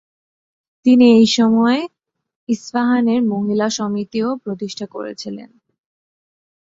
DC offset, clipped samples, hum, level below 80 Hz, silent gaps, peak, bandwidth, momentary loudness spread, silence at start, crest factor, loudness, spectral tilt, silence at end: under 0.1%; under 0.1%; none; -62 dBFS; 2.36-2.47 s; -2 dBFS; 7.8 kHz; 17 LU; 0.85 s; 16 dB; -16 LUFS; -5 dB/octave; 1.3 s